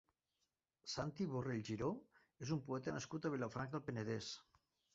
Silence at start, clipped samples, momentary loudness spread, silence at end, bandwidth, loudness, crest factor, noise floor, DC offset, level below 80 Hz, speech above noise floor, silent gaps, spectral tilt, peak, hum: 0.85 s; under 0.1%; 8 LU; 0.5 s; 7.6 kHz; -45 LUFS; 18 dB; -89 dBFS; under 0.1%; -72 dBFS; 45 dB; none; -5.5 dB/octave; -28 dBFS; none